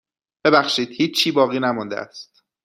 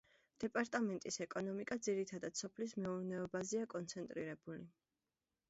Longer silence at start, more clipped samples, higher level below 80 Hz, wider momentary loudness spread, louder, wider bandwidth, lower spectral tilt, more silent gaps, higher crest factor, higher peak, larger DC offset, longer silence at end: about the same, 0.45 s vs 0.4 s; neither; first, -66 dBFS vs -80 dBFS; first, 14 LU vs 8 LU; first, -19 LUFS vs -43 LUFS; first, 15 kHz vs 8 kHz; about the same, -4 dB/octave vs -5 dB/octave; neither; about the same, 20 dB vs 20 dB; first, -2 dBFS vs -24 dBFS; neither; second, 0.4 s vs 0.8 s